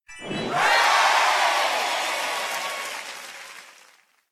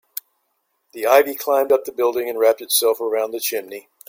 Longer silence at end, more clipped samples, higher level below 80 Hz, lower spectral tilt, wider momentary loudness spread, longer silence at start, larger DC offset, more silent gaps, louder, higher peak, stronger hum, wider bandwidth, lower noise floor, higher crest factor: first, 0.6 s vs 0.3 s; neither; about the same, -66 dBFS vs -70 dBFS; about the same, -1 dB/octave vs -0.5 dB/octave; first, 19 LU vs 12 LU; second, 0.1 s vs 0.95 s; neither; neither; about the same, -21 LUFS vs -19 LUFS; second, -8 dBFS vs -2 dBFS; neither; about the same, 16 kHz vs 17 kHz; second, -57 dBFS vs -71 dBFS; about the same, 16 dB vs 18 dB